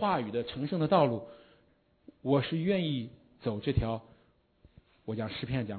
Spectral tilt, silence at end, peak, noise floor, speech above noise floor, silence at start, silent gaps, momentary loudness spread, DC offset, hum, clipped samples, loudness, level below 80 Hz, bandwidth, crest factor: -10.5 dB/octave; 0 s; -12 dBFS; -68 dBFS; 37 dB; 0 s; none; 14 LU; under 0.1%; none; under 0.1%; -32 LUFS; -54 dBFS; 4.5 kHz; 20 dB